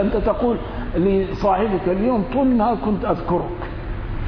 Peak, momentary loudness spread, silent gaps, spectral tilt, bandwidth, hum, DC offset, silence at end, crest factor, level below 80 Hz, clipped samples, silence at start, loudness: -6 dBFS; 10 LU; none; -9.5 dB/octave; 5.4 kHz; none; under 0.1%; 0 s; 14 dB; -30 dBFS; under 0.1%; 0 s; -21 LUFS